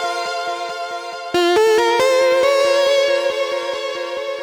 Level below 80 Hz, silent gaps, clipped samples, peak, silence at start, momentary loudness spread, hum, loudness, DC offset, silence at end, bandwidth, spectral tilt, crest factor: -60 dBFS; none; under 0.1%; -4 dBFS; 0 s; 11 LU; none; -17 LUFS; under 0.1%; 0 s; 18.5 kHz; -2 dB/octave; 12 dB